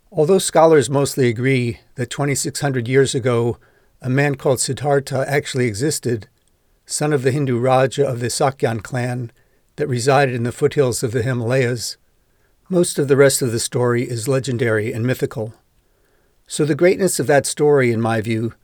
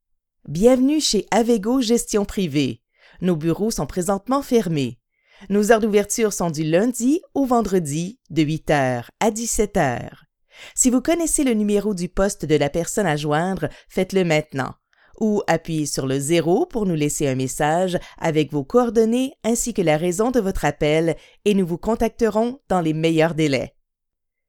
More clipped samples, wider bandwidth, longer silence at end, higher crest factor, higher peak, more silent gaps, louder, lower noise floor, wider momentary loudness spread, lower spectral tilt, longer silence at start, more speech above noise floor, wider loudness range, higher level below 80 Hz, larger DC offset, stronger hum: neither; about the same, 19.5 kHz vs 19 kHz; second, 0.1 s vs 0.8 s; about the same, 18 dB vs 20 dB; about the same, 0 dBFS vs 0 dBFS; neither; about the same, -18 LUFS vs -20 LUFS; second, -60 dBFS vs -78 dBFS; first, 10 LU vs 7 LU; about the same, -5 dB/octave vs -5 dB/octave; second, 0.1 s vs 0.45 s; second, 42 dB vs 58 dB; about the same, 2 LU vs 2 LU; second, -54 dBFS vs -42 dBFS; neither; neither